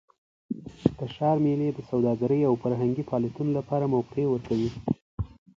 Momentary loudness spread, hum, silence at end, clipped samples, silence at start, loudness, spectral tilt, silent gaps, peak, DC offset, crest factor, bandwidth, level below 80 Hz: 9 LU; none; 0.35 s; under 0.1%; 0.5 s; -27 LUFS; -9.5 dB/octave; 5.02-5.18 s; -6 dBFS; under 0.1%; 22 dB; 7.6 kHz; -50 dBFS